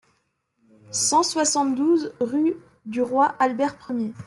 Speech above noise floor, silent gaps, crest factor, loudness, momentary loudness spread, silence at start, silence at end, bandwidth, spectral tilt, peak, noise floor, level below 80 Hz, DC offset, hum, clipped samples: 49 dB; none; 16 dB; -22 LUFS; 9 LU; 0.9 s; 0.05 s; 12.5 kHz; -2.5 dB/octave; -8 dBFS; -71 dBFS; -68 dBFS; under 0.1%; none; under 0.1%